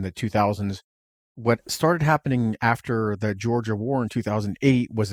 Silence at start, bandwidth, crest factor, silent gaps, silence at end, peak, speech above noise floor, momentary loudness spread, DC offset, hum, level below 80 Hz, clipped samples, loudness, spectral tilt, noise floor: 0 s; 19 kHz; 20 dB; 0.84-1.35 s; 0 s; -4 dBFS; over 67 dB; 6 LU; under 0.1%; none; -54 dBFS; under 0.1%; -24 LUFS; -6.5 dB/octave; under -90 dBFS